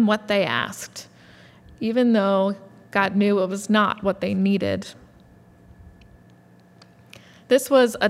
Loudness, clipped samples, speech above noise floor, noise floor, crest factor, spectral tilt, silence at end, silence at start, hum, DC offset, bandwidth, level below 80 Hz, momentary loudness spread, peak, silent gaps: -21 LUFS; under 0.1%; 31 dB; -52 dBFS; 18 dB; -5.5 dB/octave; 0 s; 0 s; none; under 0.1%; 15 kHz; -60 dBFS; 13 LU; -4 dBFS; none